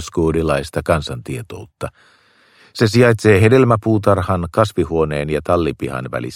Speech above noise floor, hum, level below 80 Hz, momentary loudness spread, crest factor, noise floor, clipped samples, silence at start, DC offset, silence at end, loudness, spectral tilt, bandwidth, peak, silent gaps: 35 dB; none; -38 dBFS; 17 LU; 16 dB; -51 dBFS; under 0.1%; 0 s; under 0.1%; 0 s; -16 LUFS; -6.5 dB/octave; 15.5 kHz; 0 dBFS; none